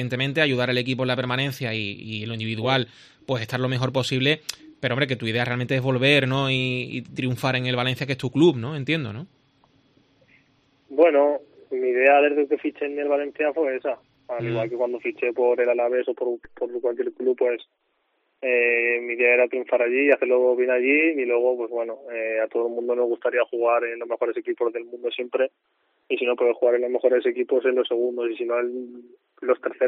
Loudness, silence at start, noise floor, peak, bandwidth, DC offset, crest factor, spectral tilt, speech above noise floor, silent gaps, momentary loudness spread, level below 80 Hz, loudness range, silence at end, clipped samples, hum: -23 LUFS; 0 s; -71 dBFS; -4 dBFS; 13 kHz; under 0.1%; 18 dB; -6 dB/octave; 48 dB; none; 11 LU; -66 dBFS; 5 LU; 0 s; under 0.1%; none